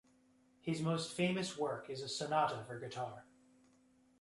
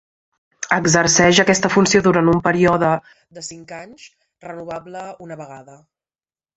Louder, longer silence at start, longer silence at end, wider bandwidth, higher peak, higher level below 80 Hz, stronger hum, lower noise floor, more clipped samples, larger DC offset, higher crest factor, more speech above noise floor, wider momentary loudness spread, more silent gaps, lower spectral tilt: second, -39 LUFS vs -15 LUFS; about the same, 0.65 s vs 0.6 s; about the same, 1 s vs 0.95 s; first, 11.5 kHz vs 8.2 kHz; second, -22 dBFS vs -2 dBFS; second, -78 dBFS vs -50 dBFS; neither; second, -70 dBFS vs under -90 dBFS; neither; neither; about the same, 18 dB vs 18 dB; second, 32 dB vs over 72 dB; second, 11 LU vs 22 LU; neither; about the same, -5 dB/octave vs -4 dB/octave